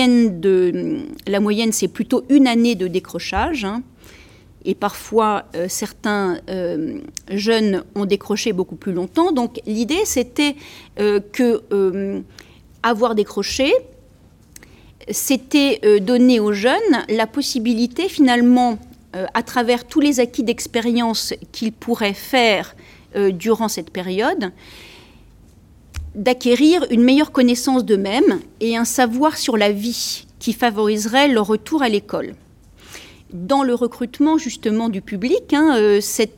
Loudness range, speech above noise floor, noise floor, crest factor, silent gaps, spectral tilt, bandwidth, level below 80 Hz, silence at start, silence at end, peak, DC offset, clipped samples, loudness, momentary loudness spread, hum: 6 LU; 31 dB; -49 dBFS; 16 dB; none; -4 dB/octave; 17 kHz; -48 dBFS; 0 s; 0.1 s; -2 dBFS; under 0.1%; under 0.1%; -18 LUFS; 11 LU; none